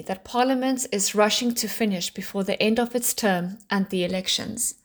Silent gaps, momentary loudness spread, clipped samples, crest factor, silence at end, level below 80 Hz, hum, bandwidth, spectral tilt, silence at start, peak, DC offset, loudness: none; 7 LU; under 0.1%; 16 dB; 0.15 s; -60 dBFS; none; over 20 kHz; -3 dB/octave; 0 s; -8 dBFS; under 0.1%; -24 LUFS